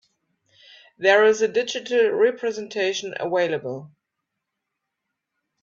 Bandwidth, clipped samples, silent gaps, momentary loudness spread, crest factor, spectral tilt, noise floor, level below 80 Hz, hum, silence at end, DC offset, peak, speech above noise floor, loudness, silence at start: 7.6 kHz; under 0.1%; none; 12 LU; 20 dB; -3.5 dB/octave; -81 dBFS; -74 dBFS; none; 1.75 s; under 0.1%; -4 dBFS; 60 dB; -21 LUFS; 1 s